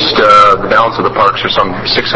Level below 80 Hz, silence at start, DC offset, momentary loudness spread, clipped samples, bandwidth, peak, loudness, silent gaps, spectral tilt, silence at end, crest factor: -38 dBFS; 0 s; under 0.1%; 7 LU; 2%; 8 kHz; 0 dBFS; -8 LUFS; none; -4.5 dB/octave; 0 s; 10 dB